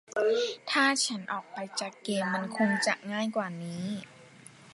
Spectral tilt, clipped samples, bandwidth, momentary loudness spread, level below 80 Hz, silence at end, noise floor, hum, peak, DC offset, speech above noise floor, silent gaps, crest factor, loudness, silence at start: -3.5 dB/octave; under 0.1%; 11.5 kHz; 11 LU; -80 dBFS; 0 s; -53 dBFS; none; -10 dBFS; under 0.1%; 23 dB; none; 20 dB; -30 LUFS; 0.1 s